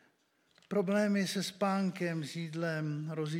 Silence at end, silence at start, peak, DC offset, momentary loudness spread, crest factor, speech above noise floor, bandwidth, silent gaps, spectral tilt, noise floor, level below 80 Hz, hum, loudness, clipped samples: 0 s; 0.7 s; -18 dBFS; under 0.1%; 7 LU; 16 dB; 39 dB; 16 kHz; none; -5.5 dB/octave; -72 dBFS; -88 dBFS; none; -34 LUFS; under 0.1%